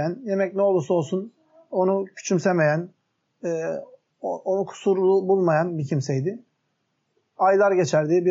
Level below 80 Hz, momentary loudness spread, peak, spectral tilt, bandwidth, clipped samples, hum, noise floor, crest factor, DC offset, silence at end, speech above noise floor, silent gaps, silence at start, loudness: -78 dBFS; 12 LU; -8 dBFS; -6.5 dB/octave; 7.8 kHz; under 0.1%; none; -73 dBFS; 16 dB; under 0.1%; 0 s; 52 dB; none; 0 s; -23 LUFS